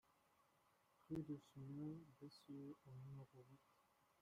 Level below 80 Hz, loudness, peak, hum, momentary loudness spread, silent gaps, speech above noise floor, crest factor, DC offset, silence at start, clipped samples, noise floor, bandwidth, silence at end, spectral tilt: -82 dBFS; -56 LUFS; -40 dBFS; none; 11 LU; none; 24 dB; 18 dB; under 0.1%; 0.1 s; under 0.1%; -80 dBFS; 15 kHz; 0.2 s; -8 dB/octave